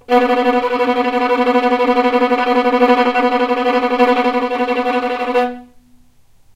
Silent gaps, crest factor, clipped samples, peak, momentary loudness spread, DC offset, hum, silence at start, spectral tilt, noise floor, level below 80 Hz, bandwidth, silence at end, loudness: none; 14 dB; under 0.1%; 0 dBFS; 5 LU; under 0.1%; none; 0.1 s; -4.5 dB/octave; -48 dBFS; -52 dBFS; 11 kHz; 0.9 s; -15 LUFS